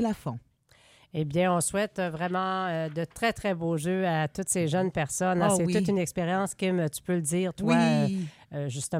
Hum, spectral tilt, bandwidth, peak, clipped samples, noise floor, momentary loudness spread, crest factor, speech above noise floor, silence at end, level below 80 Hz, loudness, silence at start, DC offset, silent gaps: none; -5 dB/octave; 16 kHz; -10 dBFS; under 0.1%; -60 dBFS; 10 LU; 18 dB; 33 dB; 0 s; -58 dBFS; -28 LUFS; 0 s; under 0.1%; none